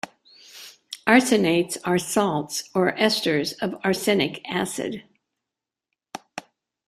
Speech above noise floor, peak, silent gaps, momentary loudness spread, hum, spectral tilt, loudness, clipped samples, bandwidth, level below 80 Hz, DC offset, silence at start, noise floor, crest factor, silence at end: 65 dB; -2 dBFS; none; 21 LU; none; -4 dB/octave; -22 LUFS; under 0.1%; 15.5 kHz; -64 dBFS; under 0.1%; 0.05 s; -87 dBFS; 22 dB; 0.5 s